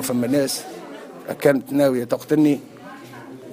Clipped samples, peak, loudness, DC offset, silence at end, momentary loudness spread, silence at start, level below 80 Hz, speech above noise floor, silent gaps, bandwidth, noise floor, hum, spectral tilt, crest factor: under 0.1%; -4 dBFS; -20 LUFS; under 0.1%; 0 s; 20 LU; 0 s; -66 dBFS; 19 dB; none; 16 kHz; -39 dBFS; none; -5.5 dB/octave; 18 dB